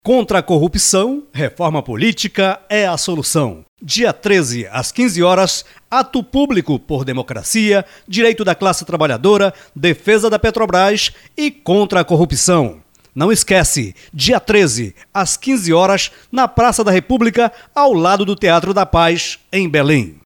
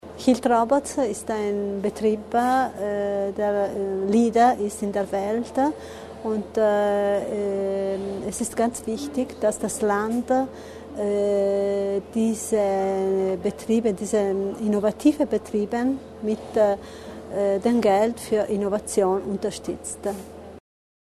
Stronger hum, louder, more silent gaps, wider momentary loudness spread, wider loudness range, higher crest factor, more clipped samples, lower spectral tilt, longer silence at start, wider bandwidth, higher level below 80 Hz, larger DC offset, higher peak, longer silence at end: neither; first, -14 LUFS vs -24 LUFS; first, 3.68-3.77 s vs none; about the same, 8 LU vs 9 LU; about the same, 2 LU vs 2 LU; about the same, 12 dB vs 16 dB; neither; second, -4 dB/octave vs -5.5 dB/octave; about the same, 0.05 s vs 0.05 s; first, 18 kHz vs 13.5 kHz; first, -36 dBFS vs -54 dBFS; neither; first, -2 dBFS vs -6 dBFS; second, 0.15 s vs 0.45 s